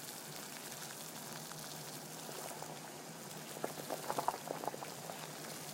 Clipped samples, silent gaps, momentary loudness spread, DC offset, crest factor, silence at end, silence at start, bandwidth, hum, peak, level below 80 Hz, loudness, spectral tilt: under 0.1%; none; 7 LU; under 0.1%; 26 dB; 0 s; 0 s; 17 kHz; none; -18 dBFS; -84 dBFS; -44 LUFS; -2.5 dB/octave